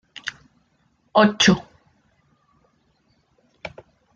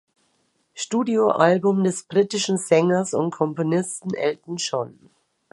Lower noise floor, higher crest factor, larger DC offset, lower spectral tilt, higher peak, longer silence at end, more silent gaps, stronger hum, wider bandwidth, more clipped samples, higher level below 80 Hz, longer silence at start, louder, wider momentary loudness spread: about the same, -65 dBFS vs -68 dBFS; about the same, 22 dB vs 20 dB; neither; about the same, -4 dB/octave vs -5 dB/octave; about the same, -2 dBFS vs -2 dBFS; second, 0.45 s vs 0.65 s; neither; neither; second, 8.8 kHz vs 11.5 kHz; neither; first, -56 dBFS vs -70 dBFS; second, 0.25 s vs 0.75 s; first, -19 LUFS vs -22 LUFS; first, 23 LU vs 10 LU